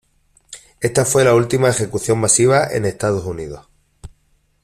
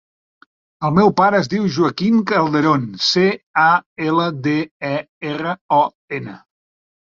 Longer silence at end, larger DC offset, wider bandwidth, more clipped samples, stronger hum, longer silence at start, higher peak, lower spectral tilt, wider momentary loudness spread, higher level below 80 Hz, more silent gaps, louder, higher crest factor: second, 0.55 s vs 0.7 s; neither; first, 15 kHz vs 7.4 kHz; neither; neither; second, 0.5 s vs 0.8 s; about the same, -2 dBFS vs -2 dBFS; second, -4.5 dB/octave vs -6 dB/octave; first, 15 LU vs 10 LU; first, -46 dBFS vs -56 dBFS; second, none vs 3.43-3.54 s, 3.86-3.96 s, 4.71-4.80 s, 5.09-5.21 s, 5.61-5.69 s, 5.95-6.08 s; about the same, -16 LUFS vs -17 LUFS; about the same, 16 dB vs 16 dB